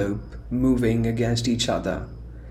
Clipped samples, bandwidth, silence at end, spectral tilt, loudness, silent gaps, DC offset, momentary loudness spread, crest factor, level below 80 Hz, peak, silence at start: under 0.1%; 14 kHz; 0 s; -5.5 dB/octave; -24 LUFS; none; under 0.1%; 12 LU; 14 dB; -38 dBFS; -10 dBFS; 0 s